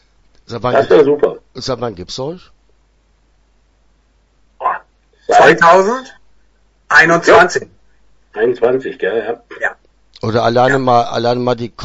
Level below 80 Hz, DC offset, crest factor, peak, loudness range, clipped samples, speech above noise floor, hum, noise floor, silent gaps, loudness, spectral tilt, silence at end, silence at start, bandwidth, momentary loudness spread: -46 dBFS; under 0.1%; 14 dB; 0 dBFS; 15 LU; under 0.1%; 42 dB; none; -55 dBFS; none; -13 LUFS; -5 dB/octave; 0 s; 0.5 s; 8 kHz; 16 LU